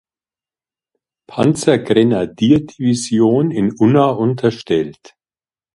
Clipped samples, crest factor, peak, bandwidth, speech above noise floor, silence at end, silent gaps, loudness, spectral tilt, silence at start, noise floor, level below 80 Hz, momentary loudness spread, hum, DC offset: under 0.1%; 16 dB; 0 dBFS; 11.5 kHz; over 75 dB; 0.85 s; none; -15 LUFS; -6.5 dB/octave; 1.3 s; under -90 dBFS; -52 dBFS; 6 LU; none; under 0.1%